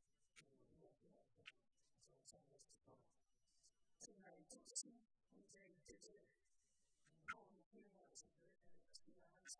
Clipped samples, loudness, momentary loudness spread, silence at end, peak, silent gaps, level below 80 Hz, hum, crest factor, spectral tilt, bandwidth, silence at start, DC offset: under 0.1%; -60 LUFS; 17 LU; 0 s; -36 dBFS; 7.66-7.71 s; -90 dBFS; none; 30 dB; -1 dB/octave; 9.6 kHz; 0.05 s; under 0.1%